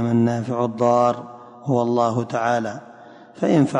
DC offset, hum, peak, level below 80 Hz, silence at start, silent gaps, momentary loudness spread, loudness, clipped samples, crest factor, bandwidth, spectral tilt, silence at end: under 0.1%; none; -6 dBFS; -62 dBFS; 0 s; none; 13 LU; -21 LUFS; under 0.1%; 14 dB; 10 kHz; -7.5 dB/octave; 0 s